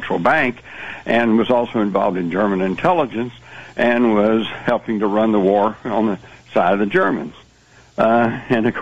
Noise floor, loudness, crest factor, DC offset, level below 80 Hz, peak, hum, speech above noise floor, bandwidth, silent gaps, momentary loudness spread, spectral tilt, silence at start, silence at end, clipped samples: -49 dBFS; -18 LUFS; 14 dB; 0.4%; -52 dBFS; -4 dBFS; none; 32 dB; 8 kHz; none; 14 LU; -7.5 dB/octave; 0 s; 0 s; under 0.1%